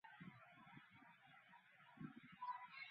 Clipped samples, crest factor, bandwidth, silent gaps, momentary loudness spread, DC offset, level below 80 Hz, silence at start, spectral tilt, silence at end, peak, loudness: under 0.1%; 20 dB; 4.9 kHz; none; 14 LU; under 0.1%; under -90 dBFS; 0.05 s; -3 dB/octave; 0 s; -40 dBFS; -59 LUFS